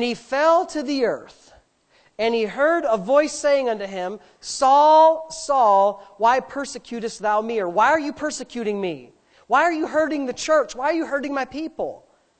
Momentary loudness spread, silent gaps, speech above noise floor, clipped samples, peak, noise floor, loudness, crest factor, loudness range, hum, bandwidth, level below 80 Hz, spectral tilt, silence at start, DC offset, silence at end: 14 LU; none; 39 dB; under 0.1%; -4 dBFS; -60 dBFS; -20 LUFS; 16 dB; 5 LU; none; 9 kHz; -60 dBFS; -3.5 dB/octave; 0 s; under 0.1%; 0.45 s